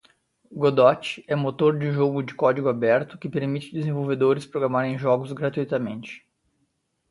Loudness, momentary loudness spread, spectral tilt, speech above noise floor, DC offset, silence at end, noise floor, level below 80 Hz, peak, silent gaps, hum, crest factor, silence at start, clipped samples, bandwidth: -23 LUFS; 10 LU; -7.5 dB/octave; 50 dB; under 0.1%; 0.9 s; -72 dBFS; -66 dBFS; -4 dBFS; none; none; 20 dB; 0.5 s; under 0.1%; 11.5 kHz